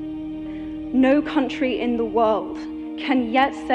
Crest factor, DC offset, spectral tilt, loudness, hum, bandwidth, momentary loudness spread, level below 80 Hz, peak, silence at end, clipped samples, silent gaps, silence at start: 14 dB; under 0.1%; -6 dB/octave; -22 LUFS; none; 8.6 kHz; 13 LU; -48 dBFS; -8 dBFS; 0 s; under 0.1%; none; 0 s